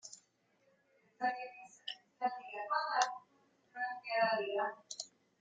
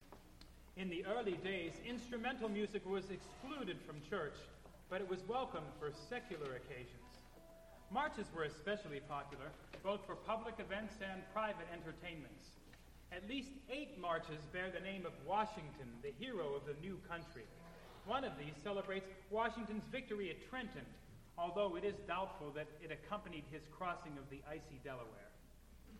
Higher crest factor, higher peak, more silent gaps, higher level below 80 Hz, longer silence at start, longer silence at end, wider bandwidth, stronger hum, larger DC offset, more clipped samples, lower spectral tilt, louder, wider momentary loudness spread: about the same, 24 dB vs 22 dB; first, -16 dBFS vs -24 dBFS; neither; second, under -90 dBFS vs -64 dBFS; about the same, 0.05 s vs 0 s; first, 0.35 s vs 0 s; second, 9.4 kHz vs 16.5 kHz; neither; neither; neither; second, -1.5 dB/octave vs -5.5 dB/octave; first, -38 LUFS vs -46 LUFS; about the same, 16 LU vs 17 LU